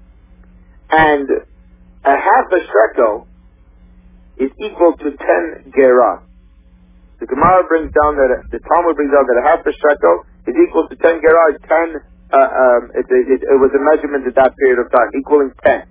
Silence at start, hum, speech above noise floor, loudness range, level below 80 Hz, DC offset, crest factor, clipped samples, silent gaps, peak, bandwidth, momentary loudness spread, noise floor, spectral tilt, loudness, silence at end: 0.9 s; none; 33 dB; 3 LU; -42 dBFS; under 0.1%; 14 dB; under 0.1%; none; 0 dBFS; 4 kHz; 9 LU; -45 dBFS; -9.5 dB/octave; -13 LUFS; 0.1 s